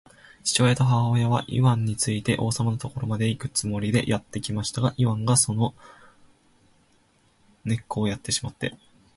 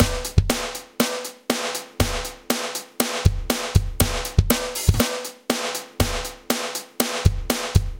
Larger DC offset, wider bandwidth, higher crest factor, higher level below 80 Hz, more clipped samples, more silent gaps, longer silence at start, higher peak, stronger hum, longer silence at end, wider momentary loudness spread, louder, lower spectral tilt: neither; second, 11.5 kHz vs 17 kHz; about the same, 20 dB vs 22 dB; second, -52 dBFS vs -30 dBFS; neither; neither; first, 0.45 s vs 0 s; second, -6 dBFS vs 0 dBFS; neither; first, 0.4 s vs 0 s; about the same, 9 LU vs 8 LU; about the same, -24 LUFS vs -23 LUFS; about the same, -5 dB/octave vs -4 dB/octave